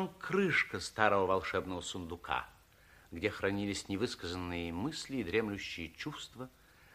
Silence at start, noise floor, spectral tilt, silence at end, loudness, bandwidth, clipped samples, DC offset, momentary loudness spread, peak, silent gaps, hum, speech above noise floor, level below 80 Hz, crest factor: 0 s; -62 dBFS; -4.5 dB/octave; 0.45 s; -35 LUFS; 15.5 kHz; under 0.1%; under 0.1%; 13 LU; -14 dBFS; none; none; 26 dB; -60 dBFS; 24 dB